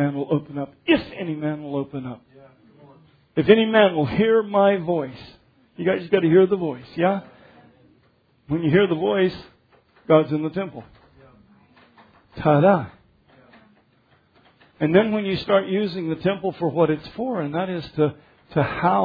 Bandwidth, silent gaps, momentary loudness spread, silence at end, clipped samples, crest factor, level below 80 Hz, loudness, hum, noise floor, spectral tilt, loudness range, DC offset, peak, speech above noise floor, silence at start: 5 kHz; none; 12 LU; 0 s; under 0.1%; 22 dB; -56 dBFS; -21 LUFS; none; -61 dBFS; -9.5 dB/octave; 5 LU; under 0.1%; 0 dBFS; 40 dB; 0 s